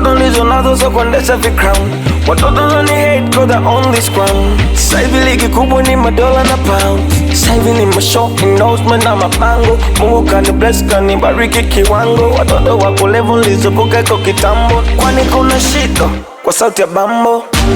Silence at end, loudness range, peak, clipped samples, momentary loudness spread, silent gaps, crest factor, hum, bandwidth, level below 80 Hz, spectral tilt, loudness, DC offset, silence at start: 0 s; 1 LU; 0 dBFS; under 0.1%; 2 LU; none; 8 dB; none; over 20 kHz; -16 dBFS; -4.5 dB/octave; -10 LUFS; under 0.1%; 0 s